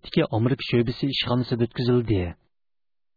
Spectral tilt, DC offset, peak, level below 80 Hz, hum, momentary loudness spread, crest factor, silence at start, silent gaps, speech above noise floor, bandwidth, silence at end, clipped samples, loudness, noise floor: -8.5 dB/octave; under 0.1%; -8 dBFS; -46 dBFS; none; 4 LU; 16 dB; 0.05 s; none; over 67 dB; 5 kHz; 0.85 s; under 0.1%; -24 LUFS; under -90 dBFS